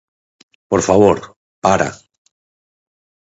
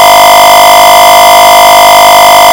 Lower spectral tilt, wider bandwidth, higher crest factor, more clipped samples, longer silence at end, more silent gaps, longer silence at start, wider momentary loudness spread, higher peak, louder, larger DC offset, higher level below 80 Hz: first, -5.5 dB/octave vs -0.5 dB/octave; second, 8 kHz vs over 20 kHz; first, 18 dB vs 0 dB; second, under 0.1% vs 50%; first, 1.3 s vs 0 s; first, 1.36-1.62 s vs none; first, 0.7 s vs 0 s; first, 10 LU vs 0 LU; about the same, 0 dBFS vs 0 dBFS; second, -15 LUFS vs 0 LUFS; second, under 0.1% vs 2%; second, -46 dBFS vs -34 dBFS